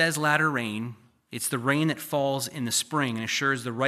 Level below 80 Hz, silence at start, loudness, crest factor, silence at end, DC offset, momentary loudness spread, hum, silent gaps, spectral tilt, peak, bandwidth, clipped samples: -76 dBFS; 0 s; -26 LUFS; 20 dB; 0 s; under 0.1%; 9 LU; none; none; -3.5 dB/octave; -8 dBFS; 15 kHz; under 0.1%